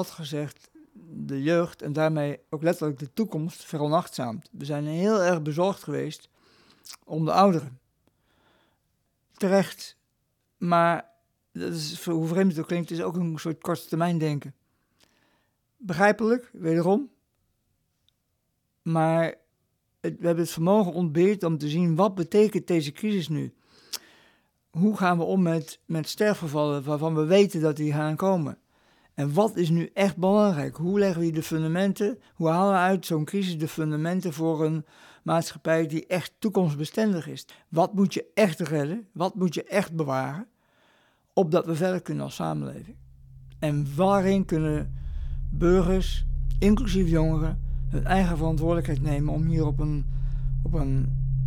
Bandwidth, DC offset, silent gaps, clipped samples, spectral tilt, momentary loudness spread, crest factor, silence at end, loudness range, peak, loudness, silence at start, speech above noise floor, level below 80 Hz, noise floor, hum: 17.5 kHz; under 0.1%; none; under 0.1%; -7 dB/octave; 12 LU; 20 dB; 0 s; 4 LU; -6 dBFS; -26 LUFS; 0 s; 51 dB; -36 dBFS; -75 dBFS; none